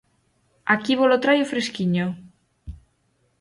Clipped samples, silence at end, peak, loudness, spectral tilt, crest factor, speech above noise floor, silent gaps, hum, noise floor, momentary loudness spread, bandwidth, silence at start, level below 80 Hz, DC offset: under 0.1%; 0.65 s; -6 dBFS; -21 LUFS; -5.5 dB/octave; 18 dB; 47 dB; none; none; -67 dBFS; 24 LU; 11.5 kHz; 0.65 s; -50 dBFS; under 0.1%